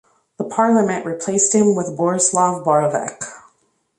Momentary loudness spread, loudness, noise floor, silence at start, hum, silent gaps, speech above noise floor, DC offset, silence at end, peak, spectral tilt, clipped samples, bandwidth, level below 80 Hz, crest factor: 13 LU; -17 LUFS; -63 dBFS; 0.4 s; none; none; 46 dB; under 0.1%; 0.6 s; -4 dBFS; -4.5 dB/octave; under 0.1%; 11 kHz; -64 dBFS; 16 dB